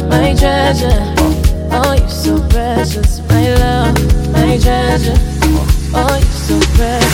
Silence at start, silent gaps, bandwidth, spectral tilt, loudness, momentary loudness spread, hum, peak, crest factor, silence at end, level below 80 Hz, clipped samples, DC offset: 0 s; none; 17 kHz; -5.5 dB/octave; -12 LUFS; 3 LU; none; 0 dBFS; 10 dB; 0 s; -14 dBFS; under 0.1%; under 0.1%